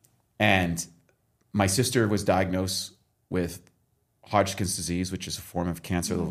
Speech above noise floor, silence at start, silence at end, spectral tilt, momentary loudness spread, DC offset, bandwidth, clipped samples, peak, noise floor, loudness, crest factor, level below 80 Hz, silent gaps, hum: 44 dB; 0.4 s; 0 s; -4.5 dB/octave; 11 LU; under 0.1%; 15.5 kHz; under 0.1%; -4 dBFS; -70 dBFS; -27 LUFS; 22 dB; -52 dBFS; none; none